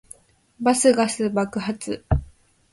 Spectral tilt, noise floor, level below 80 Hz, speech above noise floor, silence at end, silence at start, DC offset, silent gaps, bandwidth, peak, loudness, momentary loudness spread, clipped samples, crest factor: -5 dB/octave; -49 dBFS; -36 dBFS; 29 dB; 0.45 s; 0.6 s; under 0.1%; none; 11.5 kHz; -4 dBFS; -22 LUFS; 11 LU; under 0.1%; 18 dB